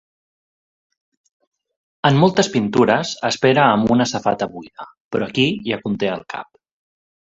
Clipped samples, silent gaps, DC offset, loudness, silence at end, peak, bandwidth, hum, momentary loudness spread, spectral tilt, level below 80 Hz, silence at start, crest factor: under 0.1%; 4.97-5.11 s; under 0.1%; -18 LUFS; 0.95 s; 0 dBFS; 8 kHz; none; 15 LU; -5.5 dB/octave; -56 dBFS; 2.05 s; 20 dB